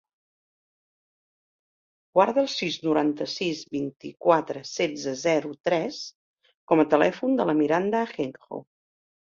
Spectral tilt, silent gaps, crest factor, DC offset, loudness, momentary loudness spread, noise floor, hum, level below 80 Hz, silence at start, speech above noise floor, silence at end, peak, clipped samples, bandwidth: -5 dB/octave; 5.60-5.64 s, 6.15-6.34 s, 6.57-6.68 s; 22 dB; under 0.1%; -25 LUFS; 12 LU; under -90 dBFS; none; -70 dBFS; 2.15 s; over 65 dB; 0.75 s; -4 dBFS; under 0.1%; 7.6 kHz